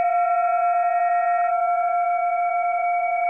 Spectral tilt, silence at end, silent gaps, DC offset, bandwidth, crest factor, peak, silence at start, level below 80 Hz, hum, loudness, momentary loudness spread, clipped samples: -3 dB/octave; 0 s; none; under 0.1%; 2.9 kHz; 8 dB; -14 dBFS; 0 s; -78 dBFS; none; -21 LUFS; 2 LU; under 0.1%